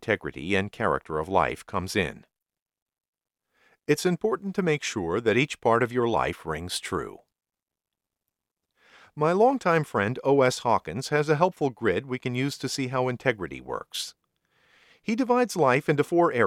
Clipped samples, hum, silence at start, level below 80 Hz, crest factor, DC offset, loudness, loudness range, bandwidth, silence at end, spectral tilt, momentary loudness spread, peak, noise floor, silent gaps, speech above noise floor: under 0.1%; none; 0 s; -56 dBFS; 20 dB; under 0.1%; -26 LUFS; 6 LU; 16 kHz; 0 s; -5 dB/octave; 11 LU; -6 dBFS; -88 dBFS; 2.62-2.66 s, 2.82-2.86 s, 3.08-3.13 s; 62 dB